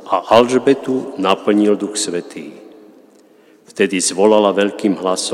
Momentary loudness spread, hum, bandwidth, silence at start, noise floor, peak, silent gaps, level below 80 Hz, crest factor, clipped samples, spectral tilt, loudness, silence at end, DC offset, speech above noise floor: 13 LU; none; 13 kHz; 0 s; -48 dBFS; 0 dBFS; none; -64 dBFS; 16 dB; under 0.1%; -4 dB/octave; -15 LUFS; 0 s; under 0.1%; 33 dB